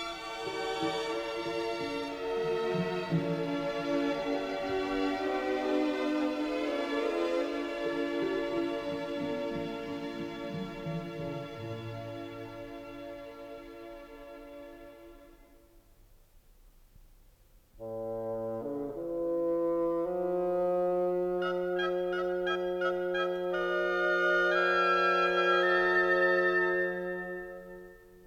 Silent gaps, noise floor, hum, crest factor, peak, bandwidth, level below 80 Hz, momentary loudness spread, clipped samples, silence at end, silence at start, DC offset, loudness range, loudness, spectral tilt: none; -61 dBFS; none; 18 dB; -14 dBFS; 14 kHz; -60 dBFS; 18 LU; under 0.1%; 0 s; 0 s; under 0.1%; 18 LU; -31 LUFS; -5.5 dB/octave